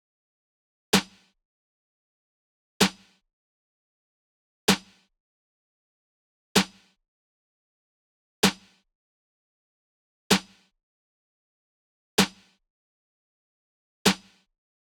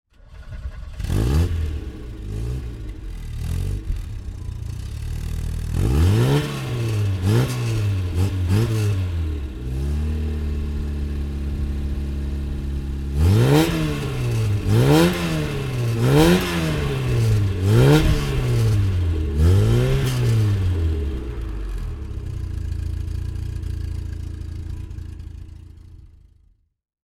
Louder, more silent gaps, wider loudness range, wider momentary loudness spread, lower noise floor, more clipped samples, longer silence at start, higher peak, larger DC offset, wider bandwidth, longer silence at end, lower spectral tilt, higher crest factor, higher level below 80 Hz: second, -25 LUFS vs -22 LUFS; first, 1.45-2.80 s, 3.33-4.68 s, 5.20-6.55 s, 7.08-8.43 s, 8.95-10.30 s, 10.83-12.18 s, 12.70-14.05 s vs none; second, 3 LU vs 11 LU; second, 5 LU vs 16 LU; first, under -90 dBFS vs -58 dBFS; neither; first, 0.95 s vs 0.3 s; about the same, -4 dBFS vs -2 dBFS; neither; first, 19 kHz vs 17 kHz; about the same, 0.85 s vs 0.95 s; second, -3 dB/octave vs -6.5 dB/octave; first, 28 dB vs 20 dB; second, -62 dBFS vs -28 dBFS